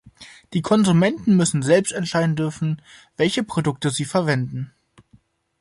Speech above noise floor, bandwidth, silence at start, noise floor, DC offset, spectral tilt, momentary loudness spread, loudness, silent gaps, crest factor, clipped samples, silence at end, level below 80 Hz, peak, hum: 37 dB; 11.5 kHz; 0.05 s; -57 dBFS; under 0.1%; -5.5 dB/octave; 11 LU; -20 LUFS; none; 16 dB; under 0.1%; 0.95 s; -58 dBFS; -4 dBFS; none